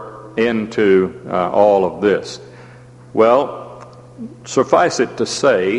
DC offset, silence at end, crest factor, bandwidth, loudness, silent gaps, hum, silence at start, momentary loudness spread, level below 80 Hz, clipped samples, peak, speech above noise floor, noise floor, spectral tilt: under 0.1%; 0 s; 16 dB; 11 kHz; -16 LUFS; none; none; 0 s; 19 LU; -54 dBFS; under 0.1%; 0 dBFS; 25 dB; -40 dBFS; -5 dB/octave